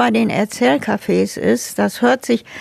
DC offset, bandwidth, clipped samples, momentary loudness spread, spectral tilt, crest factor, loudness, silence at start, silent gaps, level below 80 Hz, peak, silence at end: under 0.1%; 14.5 kHz; under 0.1%; 3 LU; -5 dB/octave; 14 dB; -17 LUFS; 0 s; none; -56 dBFS; -2 dBFS; 0 s